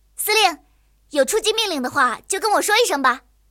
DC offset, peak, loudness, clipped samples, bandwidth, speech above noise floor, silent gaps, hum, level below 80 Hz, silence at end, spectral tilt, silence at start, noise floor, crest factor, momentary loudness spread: under 0.1%; -4 dBFS; -19 LUFS; under 0.1%; 17 kHz; 38 dB; none; none; -56 dBFS; 0.3 s; -0.5 dB/octave; 0.2 s; -57 dBFS; 16 dB; 7 LU